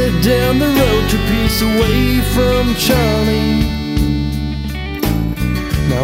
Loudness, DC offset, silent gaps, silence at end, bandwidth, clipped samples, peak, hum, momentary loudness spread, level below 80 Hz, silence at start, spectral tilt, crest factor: -15 LUFS; under 0.1%; none; 0 s; 16.5 kHz; under 0.1%; 0 dBFS; none; 6 LU; -22 dBFS; 0 s; -5.5 dB/octave; 14 dB